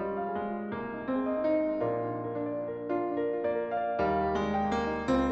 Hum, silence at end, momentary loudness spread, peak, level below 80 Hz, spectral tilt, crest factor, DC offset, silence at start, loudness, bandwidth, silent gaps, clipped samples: none; 0 s; 6 LU; -16 dBFS; -52 dBFS; -7.5 dB/octave; 14 dB; under 0.1%; 0 s; -31 LUFS; 8.2 kHz; none; under 0.1%